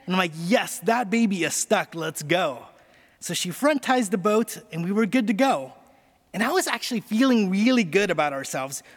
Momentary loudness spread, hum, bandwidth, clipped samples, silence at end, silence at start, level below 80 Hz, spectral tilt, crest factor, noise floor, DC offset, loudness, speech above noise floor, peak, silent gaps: 9 LU; none; 18.5 kHz; under 0.1%; 0.15 s; 0.05 s; -68 dBFS; -4 dB/octave; 18 dB; -58 dBFS; under 0.1%; -23 LUFS; 35 dB; -6 dBFS; none